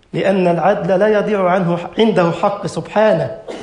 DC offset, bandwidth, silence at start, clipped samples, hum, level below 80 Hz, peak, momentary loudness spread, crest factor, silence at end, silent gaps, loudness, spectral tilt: under 0.1%; 10.5 kHz; 0.15 s; under 0.1%; none; -52 dBFS; -2 dBFS; 5 LU; 14 dB; 0 s; none; -15 LUFS; -7 dB/octave